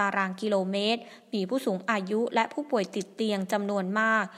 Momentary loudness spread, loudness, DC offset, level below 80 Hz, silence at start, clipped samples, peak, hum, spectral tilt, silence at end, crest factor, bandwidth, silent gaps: 5 LU; -28 LUFS; under 0.1%; -82 dBFS; 0 s; under 0.1%; -8 dBFS; none; -5 dB/octave; 0 s; 20 dB; 14.5 kHz; none